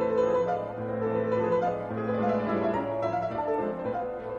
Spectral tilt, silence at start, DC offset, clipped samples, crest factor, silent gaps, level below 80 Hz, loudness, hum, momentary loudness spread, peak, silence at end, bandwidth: -8.5 dB/octave; 0 s; under 0.1%; under 0.1%; 14 dB; none; -58 dBFS; -29 LUFS; none; 6 LU; -14 dBFS; 0 s; 7.2 kHz